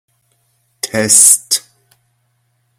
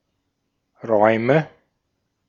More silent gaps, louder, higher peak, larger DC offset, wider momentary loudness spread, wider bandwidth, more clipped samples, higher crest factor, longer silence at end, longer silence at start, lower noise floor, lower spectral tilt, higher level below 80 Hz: neither; first, -9 LUFS vs -18 LUFS; about the same, 0 dBFS vs -2 dBFS; neither; second, 15 LU vs 19 LU; first, over 20 kHz vs 7 kHz; first, 0.3% vs under 0.1%; second, 16 dB vs 22 dB; first, 1.2 s vs 0.8 s; about the same, 0.85 s vs 0.85 s; second, -62 dBFS vs -74 dBFS; second, -1 dB/octave vs -8.5 dB/octave; first, -60 dBFS vs -68 dBFS